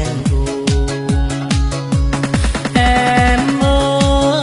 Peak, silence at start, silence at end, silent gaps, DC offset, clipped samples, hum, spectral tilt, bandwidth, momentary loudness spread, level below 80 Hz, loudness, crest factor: 0 dBFS; 0 s; 0 s; none; under 0.1%; under 0.1%; none; -5.5 dB/octave; 11.5 kHz; 5 LU; -20 dBFS; -15 LUFS; 14 dB